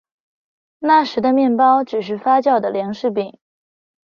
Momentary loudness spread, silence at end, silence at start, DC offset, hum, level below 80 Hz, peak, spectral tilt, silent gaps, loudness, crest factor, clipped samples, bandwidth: 9 LU; 0.85 s; 0.8 s; under 0.1%; none; -64 dBFS; -2 dBFS; -6.5 dB/octave; none; -17 LUFS; 16 dB; under 0.1%; 6.8 kHz